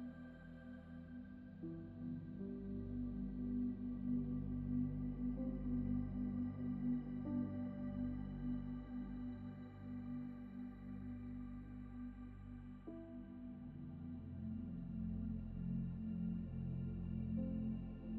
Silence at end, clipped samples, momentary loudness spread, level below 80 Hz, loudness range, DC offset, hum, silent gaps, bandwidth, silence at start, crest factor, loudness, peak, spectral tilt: 0 s; under 0.1%; 11 LU; -56 dBFS; 9 LU; under 0.1%; none; none; 4.2 kHz; 0 s; 16 dB; -46 LUFS; -30 dBFS; -10.5 dB/octave